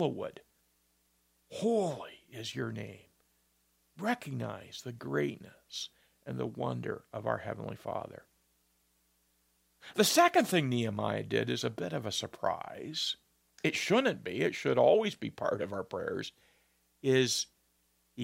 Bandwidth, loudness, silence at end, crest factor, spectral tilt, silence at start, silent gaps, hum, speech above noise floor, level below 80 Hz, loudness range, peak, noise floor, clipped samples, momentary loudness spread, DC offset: 16 kHz; -33 LUFS; 0 s; 22 dB; -4 dB/octave; 0 s; none; none; 41 dB; -74 dBFS; 9 LU; -12 dBFS; -74 dBFS; under 0.1%; 17 LU; under 0.1%